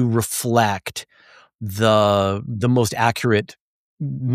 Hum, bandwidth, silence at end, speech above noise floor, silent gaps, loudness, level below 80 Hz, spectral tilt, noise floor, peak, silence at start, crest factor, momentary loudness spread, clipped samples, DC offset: none; 15.5 kHz; 0 s; 32 dB; 1.55-1.59 s, 3.60-3.97 s; -19 LUFS; -56 dBFS; -5 dB/octave; -51 dBFS; -2 dBFS; 0 s; 18 dB; 15 LU; under 0.1%; under 0.1%